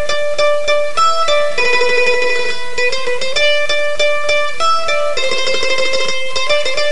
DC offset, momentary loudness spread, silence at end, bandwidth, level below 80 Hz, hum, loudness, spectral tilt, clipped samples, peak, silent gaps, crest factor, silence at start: 20%; 5 LU; 0 s; 11.5 kHz; -44 dBFS; none; -14 LUFS; -1 dB/octave; under 0.1%; -2 dBFS; none; 14 dB; 0 s